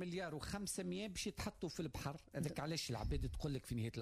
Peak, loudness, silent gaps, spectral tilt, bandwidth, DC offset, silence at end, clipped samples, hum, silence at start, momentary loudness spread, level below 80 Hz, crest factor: -32 dBFS; -45 LUFS; none; -5 dB/octave; 15.5 kHz; under 0.1%; 0 s; under 0.1%; none; 0 s; 3 LU; -54 dBFS; 12 dB